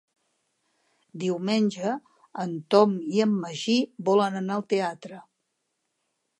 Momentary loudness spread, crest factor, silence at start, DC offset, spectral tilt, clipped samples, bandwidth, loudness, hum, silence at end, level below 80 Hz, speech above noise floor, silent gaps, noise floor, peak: 14 LU; 22 dB; 1.15 s; under 0.1%; -6 dB/octave; under 0.1%; 11 kHz; -25 LUFS; none; 1.2 s; -80 dBFS; 53 dB; none; -78 dBFS; -6 dBFS